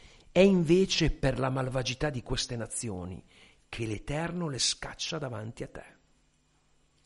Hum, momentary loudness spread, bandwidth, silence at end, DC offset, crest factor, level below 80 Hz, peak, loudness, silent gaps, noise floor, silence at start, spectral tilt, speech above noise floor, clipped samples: none; 18 LU; 11.5 kHz; 1.2 s; under 0.1%; 22 dB; -46 dBFS; -8 dBFS; -29 LUFS; none; -69 dBFS; 0.35 s; -4.5 dB/octave; 39 dB; under 0.1%